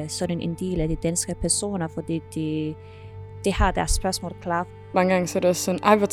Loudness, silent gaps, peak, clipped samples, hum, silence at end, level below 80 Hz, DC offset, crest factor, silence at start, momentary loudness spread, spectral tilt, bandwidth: -24 LUFS; none; -2 dBFS; under 0.1%; none; 0 s; -34 dBFS; under 0.1%; 22 dB; 0 s; 9 LU; -4.5 dB/octave; 17 kHz